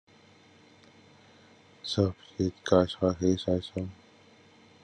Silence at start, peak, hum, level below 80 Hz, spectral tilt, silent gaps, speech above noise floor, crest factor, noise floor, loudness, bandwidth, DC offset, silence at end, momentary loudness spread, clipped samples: 1.85 s; -8 dBFS; none; -64 dBFS; -6.5 dB/octave; none; 30 dB; 24 dB; -58 dBFS; -29 LUFS; 10 kHz; under 0.1%; 0.9 s; 13 LU; under 0.1%